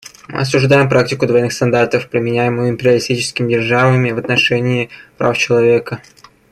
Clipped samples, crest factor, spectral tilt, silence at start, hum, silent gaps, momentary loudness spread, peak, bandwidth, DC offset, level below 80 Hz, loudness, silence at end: under 0.1%; 14 dB; -5.5 dB/octave; 0.05 s; none; none; 8 LU; 0 dBFS; 12.5 kHz; under 0.1%; -50 dBFS; -14 LUFS; 0.5 s